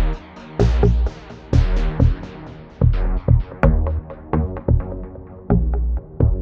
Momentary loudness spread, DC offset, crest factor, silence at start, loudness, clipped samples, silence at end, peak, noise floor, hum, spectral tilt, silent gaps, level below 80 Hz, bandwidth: 15 LU; under 0.1%; 18 dB; 0 s; -20 LUFS; under 0.1%; 0 s; 0 dBFS; -36 dBFS; none; -9 dB/octave; none; -20 dBFS; 6.8 kHz